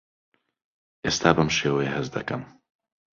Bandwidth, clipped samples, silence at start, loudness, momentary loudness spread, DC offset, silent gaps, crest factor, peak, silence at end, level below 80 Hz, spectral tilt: 7.6 kHz; under 0.1%; 1.05 s; -24 LUFS; 12 LU; under 0.1%; none; 24 dB; -2 dBFS; 0.65 s; -52 dBFS; -4.5 dB/octave